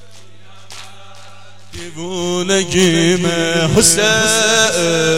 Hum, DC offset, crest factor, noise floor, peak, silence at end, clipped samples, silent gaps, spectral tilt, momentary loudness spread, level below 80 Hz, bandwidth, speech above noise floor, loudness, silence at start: none; 2%; 16 dB; -43 dBFS; 0 dBFS; 0 s; under 0.1%; none; -3 dB/octave; 21 LU; -44 dBFS; 16.5 kHz; 29 dB; -13 LUFS; 0.7 s